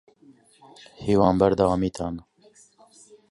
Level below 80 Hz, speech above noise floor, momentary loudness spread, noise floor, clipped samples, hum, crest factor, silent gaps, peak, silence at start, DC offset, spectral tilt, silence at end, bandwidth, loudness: -48 dBFS; 34 dB; 14 LU; -56 dBFS; under 0.1%; none; 20 dB; none; -4 dBFS; 1 s; under 0.1%; -7.5 dB/octave; 1.1 s; 11.5 kHz; -23 LUFS